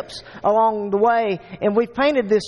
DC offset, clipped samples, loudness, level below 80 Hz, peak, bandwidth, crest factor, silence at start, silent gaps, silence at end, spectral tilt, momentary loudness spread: under 0.1%; under 0.1%; -19 LUFS; -54 dBFS; -6 dBFS; 11 kHz; 12 dB; 0 s; none; 0 s; -6 dB/octave; 7 LU